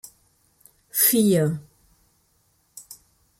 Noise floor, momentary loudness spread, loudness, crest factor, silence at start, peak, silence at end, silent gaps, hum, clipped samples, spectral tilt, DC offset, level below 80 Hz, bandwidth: -66 dBFS; 25 LU; -20 LUFS; 20 dB; 0.95 s; -6 dBFS; 0.45 s; none; none; under 0.1%; -4.5 dB/octave; under 0.1%; -64 dBFS; 16.5 kHz